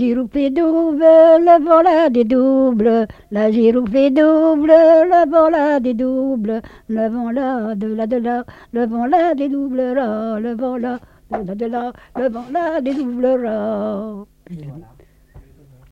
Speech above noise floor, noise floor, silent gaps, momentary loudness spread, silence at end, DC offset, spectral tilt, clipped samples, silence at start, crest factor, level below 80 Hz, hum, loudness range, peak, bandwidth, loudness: 31 dB; -46 dBFS; none; 15 LU; 0.5 s; under 0.1%; -8 dB/octave; under 0.1%; 0 s; 16 dB; -48 dBFS; none; 9 LU; 0 dBFS; 5.8 kHz; -15 LUFS